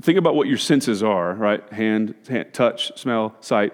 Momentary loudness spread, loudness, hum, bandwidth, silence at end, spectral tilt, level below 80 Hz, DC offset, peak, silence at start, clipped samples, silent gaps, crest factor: 7 LU; -21 LUFS; none; 16.5 kHz; 0 s; -5 dB/octave; -74 dBFS; under 0.1%; -4 dBFS; 0.05 s; under 0.1%; none; 16 dB